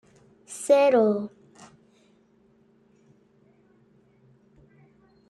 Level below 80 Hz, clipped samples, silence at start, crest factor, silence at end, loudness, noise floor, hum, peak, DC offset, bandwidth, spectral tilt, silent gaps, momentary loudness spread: -74 dBFS; under 0.1%; 0.5 s; 20 dB; 4 s; -22 LUFS; -61 dBFS; none; -8 dBFS; under 0.1%; 12.5 kHz; -5 dB/octave; none; 21 LU